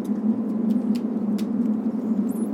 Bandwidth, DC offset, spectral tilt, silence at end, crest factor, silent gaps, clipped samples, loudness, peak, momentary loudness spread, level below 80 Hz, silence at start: 14 kHz; under 0.1%; -8.5 dB/octave; 0 s; 12 dB; none; under 0.1%; -24 LUFS; -12 dBFS; 2 LU; -78 dBFS; 0 s